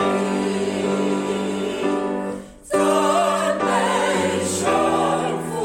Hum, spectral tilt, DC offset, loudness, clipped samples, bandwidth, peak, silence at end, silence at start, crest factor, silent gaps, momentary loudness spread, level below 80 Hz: none; -4.5 dB/octave; under 0.1%; -21 LUFS; under 0.1%; 16.5 kHz; -6 dBFS; 0 s; 0 s; 14 dB; none; 6 LU; -54 dBFS